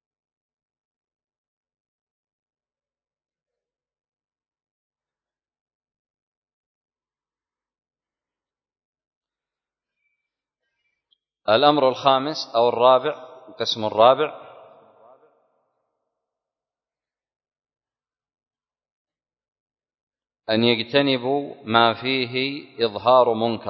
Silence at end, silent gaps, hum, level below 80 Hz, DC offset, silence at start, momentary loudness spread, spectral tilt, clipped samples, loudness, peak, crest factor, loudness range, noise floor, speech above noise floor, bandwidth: 0 s; 17.36-17.40 s, 18.92-19.05 s, 19.48-19.52 s, 19.60-19.66 s, 20.01-20.07 s; none; -70 dBFS; under 0.1%; 11.45 s; 11 LU; -5.5 dB/octave; under 0.1%; -20 LUFS; 0 dBFS; 26 dB; 7 LU; under -90 dBFS; over 71 dB; 6.4 kHz